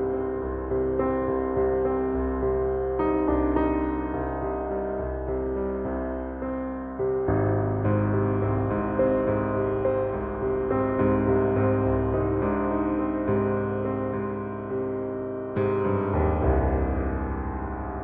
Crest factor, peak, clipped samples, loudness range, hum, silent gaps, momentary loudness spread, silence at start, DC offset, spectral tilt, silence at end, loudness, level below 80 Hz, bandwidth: 14 dB; -12 dBFS; under 0.1%; 3 LU; none; none; 7 LU; 0 s; under 0.1%; -9.5 dB/octave; 0 s; -26 LUFS; -36 dBFS; 3.6 kHz